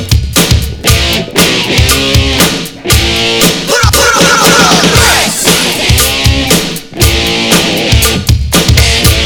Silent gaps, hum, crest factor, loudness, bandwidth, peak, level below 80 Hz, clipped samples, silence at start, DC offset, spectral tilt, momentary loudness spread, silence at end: none; none; 8 dB; -7 LUFS; over 20 kHz; 0 dBFS; -16 dBFS; 2%; 0 s; under 0.1%; -3 dB/octave; 5 LU; 0 s